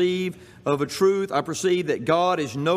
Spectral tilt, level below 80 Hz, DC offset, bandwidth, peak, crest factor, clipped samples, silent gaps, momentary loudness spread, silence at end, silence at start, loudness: -5 dB/octave; -64 dBFS; under 0.1%; 15 kHz; -6 dBFS; 16 dB; under 0.1%; none; 7 LU; 0 s; 0 s; -23 LUFS